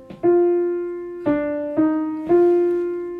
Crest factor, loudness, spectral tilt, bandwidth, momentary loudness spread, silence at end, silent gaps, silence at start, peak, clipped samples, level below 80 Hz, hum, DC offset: 12 dB; -20 LUFS; -9.5 dB/octave; 3.5 kHz; 8 LU; 0 s; none; 0 s; -8 dBFS; under 0.1%; -56 dBFS; none; under 0.1%